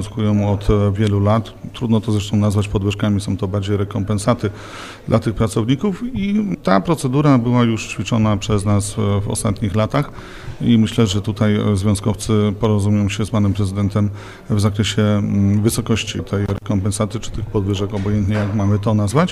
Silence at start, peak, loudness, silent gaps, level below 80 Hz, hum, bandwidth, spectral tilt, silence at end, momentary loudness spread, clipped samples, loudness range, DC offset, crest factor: 0 s; 0 dBFS; -18 LUFS; none; -36 dBFS; none; 13 kHz; -6.5 dB/octave; 0 s; 6 LU; under 0.1%; 3 LU; under 0.1%; 18 dB